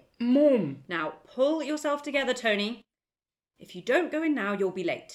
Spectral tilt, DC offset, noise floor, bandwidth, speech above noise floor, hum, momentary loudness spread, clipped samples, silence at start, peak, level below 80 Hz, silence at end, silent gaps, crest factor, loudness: -5 dB/octave; under 0.1%; under -90 dBFS; 12.5 kHz; over 63 dB; none; 11 LU; under 0.1%; 0.2 s; -12 dBFS; -74 dBFS; 0 s; none; 16 dB; -27 LUFS